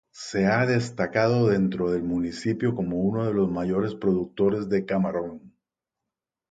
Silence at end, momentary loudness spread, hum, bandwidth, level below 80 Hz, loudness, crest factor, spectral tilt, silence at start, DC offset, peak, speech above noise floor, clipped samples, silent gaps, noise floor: 1.05 s; 6 LU; none; 9.2 kHz; -54 dBFS; -25 LUFS; 18 dB; -7 dB/octave; 0.15 s; under 0.1%; -8 dBFS; 63 dB; under 0.1%; none; -87 dBFS